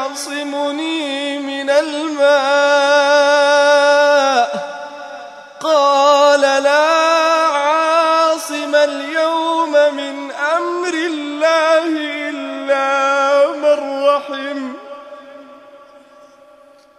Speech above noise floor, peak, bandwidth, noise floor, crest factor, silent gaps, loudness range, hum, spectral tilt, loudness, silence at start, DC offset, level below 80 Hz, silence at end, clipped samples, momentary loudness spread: 30 dB; -2 dBFS; 13 kHz; -46 dBFS; 14 dB; none; 4 LU; none; -1 dB/octave; -14 LUFS; 0 s; under 0.1%; -74 dBFS; 1.2 s; under 0.1%; 13 LU